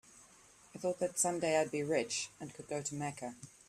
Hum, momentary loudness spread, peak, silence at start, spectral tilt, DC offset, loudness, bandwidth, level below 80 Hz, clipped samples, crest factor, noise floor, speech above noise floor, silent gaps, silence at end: none; 13 LU; -18 dBFS; 0.15 s; -3.5 dB/octave; under 0.1%; -36 LUFS; 14.5 kHz; -76 dBFS; under 0.1%; 20 dB; -62 dBFS; 26 dB; none; 0.2 s